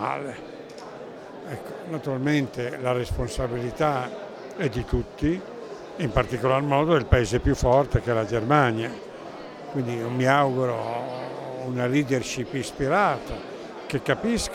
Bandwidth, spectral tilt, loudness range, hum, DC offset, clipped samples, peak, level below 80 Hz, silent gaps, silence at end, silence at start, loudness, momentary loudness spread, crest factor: 15.5 kHz; -6 dB/octave; 6 LU; none; under 0.1%; under 0.1%; -2 dBFS; -40 dBFS; none; 0 s; 0 s; -25 LUFS; 17 LU; 22 dB